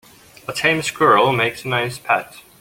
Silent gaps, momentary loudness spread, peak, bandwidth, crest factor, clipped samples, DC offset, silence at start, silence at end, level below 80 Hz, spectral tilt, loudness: none; 14 LU; -2 dBFS; 17 kHz; 18 dB; under 0.1%; under 0.1%; 0.5 s; 0.2 s; -56 dBFS; -4 dB/octave; -18 LUFS